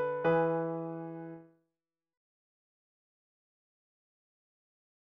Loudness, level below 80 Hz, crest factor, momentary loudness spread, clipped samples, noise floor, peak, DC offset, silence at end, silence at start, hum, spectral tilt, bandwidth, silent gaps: -33 LUFS; -76 dBFS; 20 dB; 18 LU; under 0.1%; under -90 dBFS; -18 dBFS; under 0.1%; 3.6 s; 0 s; none; -6.5 dB/octave; 5.2 kHz; none